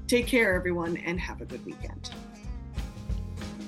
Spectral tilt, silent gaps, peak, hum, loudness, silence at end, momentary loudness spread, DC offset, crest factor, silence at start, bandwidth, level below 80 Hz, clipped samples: -5 dB/octave; none; -12 dBFS; none; -30 LUFS; 0 s; 17 LU; under 0.1%; 18 dB; 0 s; 13.5 kHz; -40 dBFS; under 0.1%